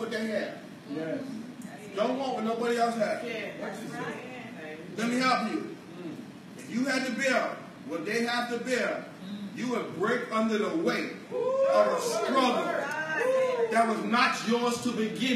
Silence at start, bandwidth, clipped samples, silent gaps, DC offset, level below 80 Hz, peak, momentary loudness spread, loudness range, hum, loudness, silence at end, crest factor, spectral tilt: 0 s; 15 kHz; under 0.1%; none; under 0.1%; -80 dBFS; -12 dBFS; 15 LU; 5 LU; none; -29 LUFS; 0 s; 18 dB; -4 dB/octave